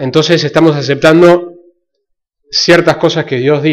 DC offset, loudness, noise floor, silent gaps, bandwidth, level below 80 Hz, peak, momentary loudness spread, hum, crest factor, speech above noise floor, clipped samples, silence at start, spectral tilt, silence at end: under 0.1%; -9 LUFS; -68 dBFS; none; 11.5 kHz; -46 dBFS; 0 dBFS; 7 LU; none; 10 dB; 59 dB; 0.4%; 0 s; -5.5 dB/octave; 0 s